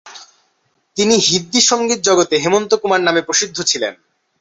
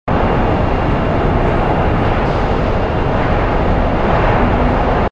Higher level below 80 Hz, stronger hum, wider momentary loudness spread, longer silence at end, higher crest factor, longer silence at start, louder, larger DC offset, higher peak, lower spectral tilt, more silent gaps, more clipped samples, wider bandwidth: second, -60 dBFS vs -20 dBFS; neither; first, 6 LU vs 2 LU; first, 0.45 s vs 0.05 s; about the same, 16 dB vs 12 dB; about the same, 0.05 s vs 0.05 s; about the same, -14 LUFS vs -15 LUFS; neither; about the same, 0 dBFS vs 0 dBFS; second, -2 dB/octave vs -8.5 dB/octave; neither; neither; first, 8.4 kHz vs 7.2 kHz